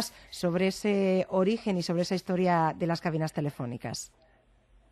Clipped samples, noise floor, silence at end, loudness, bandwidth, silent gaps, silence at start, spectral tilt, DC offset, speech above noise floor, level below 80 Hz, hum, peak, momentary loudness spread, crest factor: under 0.1%; -63 dBFS; 0.85 s; -29 LUFS; 13 kHz; none; 0 s; -6 dB/octave; under 0.1%; 34 dB; -62 dBFS; none; -14 dBFS; 10 LU; 14 dB